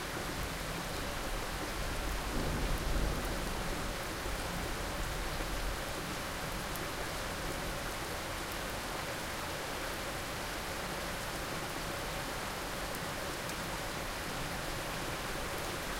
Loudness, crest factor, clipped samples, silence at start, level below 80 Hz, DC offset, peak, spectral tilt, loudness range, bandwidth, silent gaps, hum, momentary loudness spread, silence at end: -38 LUFS; 16 dB; under 0.1%; 0 s; -44 dBFS; under 0.1%; -22 dBFS; -3.5 dB/octave; 1 LU; 17 kHz; none; none; 2 LU; 0 s